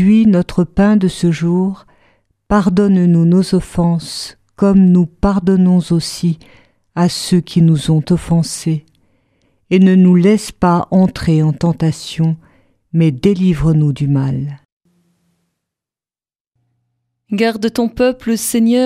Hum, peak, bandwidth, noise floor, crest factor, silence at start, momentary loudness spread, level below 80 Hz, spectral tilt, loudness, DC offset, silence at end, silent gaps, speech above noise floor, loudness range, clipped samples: none; 0 dBFS; 14.5 kHz; under -90 dBFS; 14 dB; 0 s; 9 LU; -36 dBFS; -7 dB/octave; -14 LUFS; under 0.1%; 0 s; 14.65-14.80 s, 16.40-16.52 s; over 78 dB; 7 LU; under 0.1%